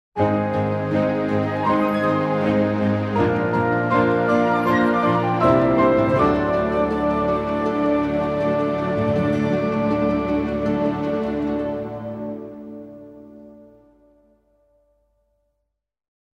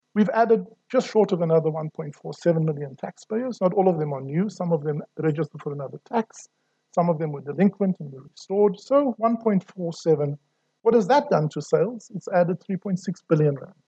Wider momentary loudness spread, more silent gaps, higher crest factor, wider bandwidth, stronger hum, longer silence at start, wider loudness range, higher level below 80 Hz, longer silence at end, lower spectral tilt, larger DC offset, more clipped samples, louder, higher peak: second, 8 LU vs 12 LU; neither; about the same, 18 dB vs 18 dB; first, 12.5 kHz vs 8.4 kHz; neither; about the same, 0.15 s vs 0.15 s; first, 11 LU vs 4 LU; first, -46 dBFS vs -76 dBFS; first, 2.8 s vs 0.2 s; about the same, -8.5 dB/octave vs -8 dB/octave; neither; neither; first, -20 LUFS vs -24 LUFS; about the same, -4 dBFS vs -6 dBFS